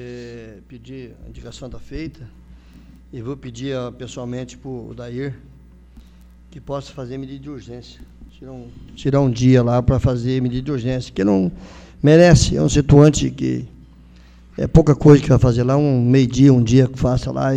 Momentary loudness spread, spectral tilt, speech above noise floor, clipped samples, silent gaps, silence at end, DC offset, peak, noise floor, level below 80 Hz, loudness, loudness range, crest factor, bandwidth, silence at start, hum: 25 LU; -7 dB/octave; 28 dB; under 0.1%; none; 0 s; under 0.1%; 0 dBFS; -45 dBFS; -34 dBFS; -16 LUFS; 19 LU; 18 dB; 9.4 kHz; 0 s; none